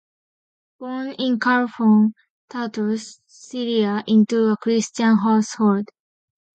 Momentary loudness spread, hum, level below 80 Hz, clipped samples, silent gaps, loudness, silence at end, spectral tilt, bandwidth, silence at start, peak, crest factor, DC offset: 15 LU; none; -70 dBFS; under 0.1%; 2.30-2.48 s; -20 LUFS; 0.7 s; -5.5 dB/octave; 8.6 kHz; 0.8 s; -6 dBFS; 14 dB; under 0.1%